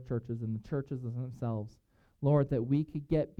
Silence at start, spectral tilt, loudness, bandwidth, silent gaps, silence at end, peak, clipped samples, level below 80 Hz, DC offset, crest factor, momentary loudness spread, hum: 0 s; -10.5 dB/octave; -34 LUFS; 5.8 kHz; none; 0.1 s; -16 dBFS; under 0.1%; -56 dBFS; under 0.1%; 16 dB; 10 LU; none